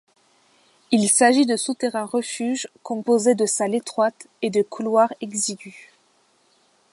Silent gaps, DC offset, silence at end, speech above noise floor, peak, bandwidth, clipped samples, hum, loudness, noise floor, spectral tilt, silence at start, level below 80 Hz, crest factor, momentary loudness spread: none; under 0.1%; 1.15 s; 41 dB; -4 dBFS; 11.5 kHz; under 0.1%; none; -21 LUFS; -62 dBFS; -3 dB/octave; 0.9 s; -74 dBFS; 18 dB; 12 LU